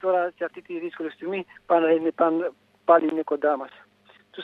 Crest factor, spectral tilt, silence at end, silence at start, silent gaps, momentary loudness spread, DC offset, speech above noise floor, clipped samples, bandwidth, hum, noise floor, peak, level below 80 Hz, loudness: 20 dB; -7.5 dB/octave; 0 s; 0.05 s; none; 14 LU; under 0.1%; 34 dB; under 0.1%; 4.4 kHz; none; -57 dBFS; -4 dBFS; -78 dBFS; -24 LUFS